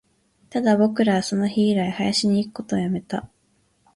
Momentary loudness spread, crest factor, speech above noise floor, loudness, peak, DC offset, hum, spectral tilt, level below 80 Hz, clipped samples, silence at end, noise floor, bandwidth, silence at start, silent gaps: 9 LU; 16 dB; 44 dB; -22 LUFS; -6 dBFS; under 0.1%; none; -5.5 dB/octave; -58 dBFS; under 0.1%; 0.7 s; -65 dBFS; 11.5 kHz; 0.55 s; none